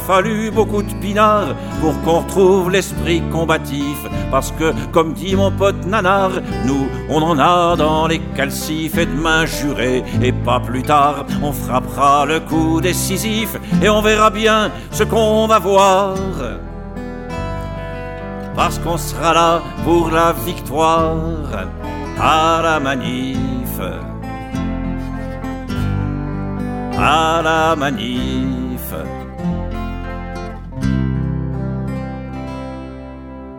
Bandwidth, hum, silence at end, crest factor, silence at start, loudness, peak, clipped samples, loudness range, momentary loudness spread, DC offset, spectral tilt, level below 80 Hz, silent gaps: 17.5 kHz; none; 0 s; 16 dB; 0 s; -17 LUFS; 0 dBFS; under 0.1%; 8 LU; 14 LU; under 0.1%; -5.5 dB/octave; -30 dBFS; none